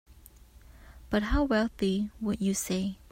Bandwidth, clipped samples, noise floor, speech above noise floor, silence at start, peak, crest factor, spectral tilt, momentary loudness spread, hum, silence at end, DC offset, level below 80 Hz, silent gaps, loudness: 16 kHz; under 0.1%; -54 dBFS; 25 dB; 0.1 s; -14 dBFS; 16 dB; -5 dB/octave; 5 LU; none; 0.15 s; under 0.1%; -42 dBFS; none; -30 LUFS